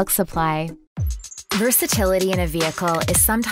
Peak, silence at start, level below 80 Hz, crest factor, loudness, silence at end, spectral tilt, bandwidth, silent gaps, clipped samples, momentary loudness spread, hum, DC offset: -4 dBFS; 0 s; -34 dBFS; 16 dB; -20 LUFS; 0 s; -3.5 dB/octave; 16.5 kHz; 0.87-0.96 s; under 0.1%; 12 LU; none; under 0.1%